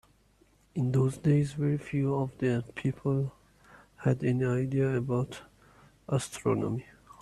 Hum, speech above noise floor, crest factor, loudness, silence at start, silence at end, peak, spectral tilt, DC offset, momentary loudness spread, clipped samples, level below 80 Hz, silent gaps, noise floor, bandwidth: none; 36 dB; 16 dB; -30 LUFS; 0.75 s; 0.4 s; -14 dBFS; -7.5 dB/octave; under 0.1%; 7 LU; under 0.1%; -60 dBFS; none; -64 dBFS; 12 kHz